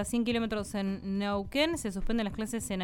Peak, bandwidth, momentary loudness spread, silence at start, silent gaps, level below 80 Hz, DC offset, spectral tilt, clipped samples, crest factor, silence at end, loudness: -14 dBFS; 18.5 kHz; 5 LU; 0 s; none; -44 dBFS; under 0.1%; -4.5 dB/octave; under 0.1%; 16 dB; 0 s; -32 LUFS